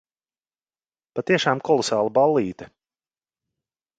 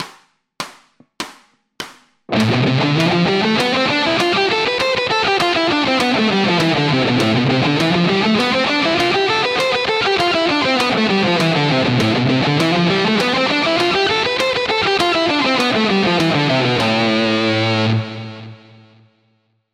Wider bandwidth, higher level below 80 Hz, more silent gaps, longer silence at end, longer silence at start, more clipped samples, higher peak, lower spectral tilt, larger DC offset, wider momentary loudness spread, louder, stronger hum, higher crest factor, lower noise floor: second, 9.4 kHz vs 15 kHz; second, -64 dBFS vs -50 dBFS; neither; about the same, 1.3 s vs 1.2 s; first, 1.15 s vs 0 s; neither; second, -4 dBFS vs 0 dBFS; about the same, -4.5 dB/octave vs -5 dB/octave; neither; first, 13 LU vs 7 LU; second, -21 LUFS vs -15 LUFS; neither; first, 22 dB vs 16 dB; first, under -90 dBFS vs -62 dBFS